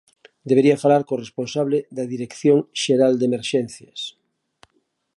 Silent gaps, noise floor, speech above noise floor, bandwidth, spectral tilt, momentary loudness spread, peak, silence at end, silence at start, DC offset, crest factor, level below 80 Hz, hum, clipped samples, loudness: none; -69 dBFS; 49 dB; 11.5 kHz; -5.5 dB/octave; 15 LU; -4 dBFS; 1.1 s; 0.45 s; under 0.1%; 18 dB; -68 dBFS; none; under 0.1%; -20 LUFS